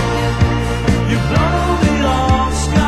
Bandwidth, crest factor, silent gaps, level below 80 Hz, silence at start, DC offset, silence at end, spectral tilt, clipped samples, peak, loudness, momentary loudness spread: 12.5 kHz; 14 dB; none; -20 dBFS; 0 s; under 0.1%; 0 s; -6 dB/octave; under 0.1%; 0 dBFS; -15 LUFS; 2 LU